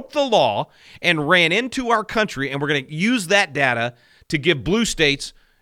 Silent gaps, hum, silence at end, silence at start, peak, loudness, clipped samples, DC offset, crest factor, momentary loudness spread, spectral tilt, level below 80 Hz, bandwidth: none; none; 0.3 s; 0 s; -2 dBFS; -19 LUFS; under 0.1%; under 0.1%; 18 dB; 10 LU; -4 dB/octave; -46 dBFS; 16.5 kHz